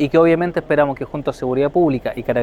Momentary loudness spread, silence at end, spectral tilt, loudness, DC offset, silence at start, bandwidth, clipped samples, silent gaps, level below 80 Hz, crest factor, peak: 9 LU; 0 s; -8 dB/octave; -18 LUFS; under 0.1%; 0 s; 12 kHz; under 0.1%; none; -44 dBFS; 16 dB; -2 dBFS